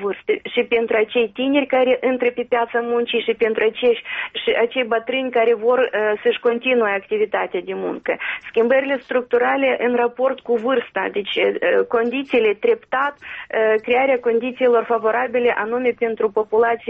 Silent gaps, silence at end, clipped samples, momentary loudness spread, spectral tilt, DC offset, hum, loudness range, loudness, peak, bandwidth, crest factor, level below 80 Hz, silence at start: none; 0 s; under 0.1%; 6 LU; -1 dB/octave; under 0.1%; none; 1 LU; -19 LUFS; -6 dBFS; 4 kHz; 12 dB; -62 dBFS; 0 s